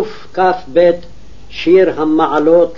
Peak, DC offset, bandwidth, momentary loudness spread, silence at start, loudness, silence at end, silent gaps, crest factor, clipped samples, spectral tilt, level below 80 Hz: 0 dBFS; 4%; 7.2 kHz; 11 LU; 0 s; -13 LUFS; 0.05 s; none; 12 dB; under 0.1%; -7 dB/octave; -44 dBFS